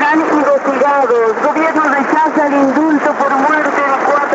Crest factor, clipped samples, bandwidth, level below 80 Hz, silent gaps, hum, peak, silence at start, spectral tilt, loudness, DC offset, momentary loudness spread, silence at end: 10 dB; under 0.1%; 8 kHz; -64 dBFS; none; none; 0 dBFS; 0 s; -3 dB/octave; -12 LUFS; under 0.1%; 2 LU; 0 s